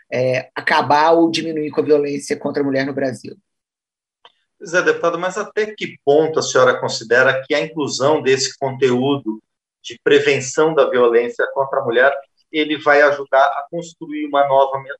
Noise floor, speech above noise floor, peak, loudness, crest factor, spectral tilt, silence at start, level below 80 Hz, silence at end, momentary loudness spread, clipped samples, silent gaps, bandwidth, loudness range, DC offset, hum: -89 dBFS; 72 dB; -2 dBFS; -17 LUFS; 16 dB; -4 dB/octave; 0.1 s; -68 dBFS; 0.05 s; 10 LU; under 0.1%; none; 11.5 kHz; 6 LU; under 0.1%; none